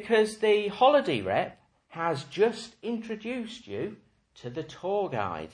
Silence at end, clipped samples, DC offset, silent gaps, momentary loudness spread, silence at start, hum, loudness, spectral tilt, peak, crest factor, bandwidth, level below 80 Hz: 0.05 s; under 0.1%; under 0.1%; none; 16 LU; 0 s; none; -28 LUFS; -5 dB/octave; -10 dBFS; 20 dB; 10.5 kHz; -66 dBFS